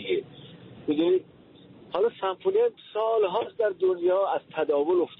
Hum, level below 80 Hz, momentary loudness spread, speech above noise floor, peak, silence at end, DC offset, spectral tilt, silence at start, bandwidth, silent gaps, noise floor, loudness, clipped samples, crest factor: none; -72 dBFS; 9 LU; 26 dB; -14 dBFS; 0.05 s; under 0.1%; -4 dB/octave; 0 s; 4.1 kHz; none; -51 dBFS; -26 LUFS; under 0.1%; 12 dB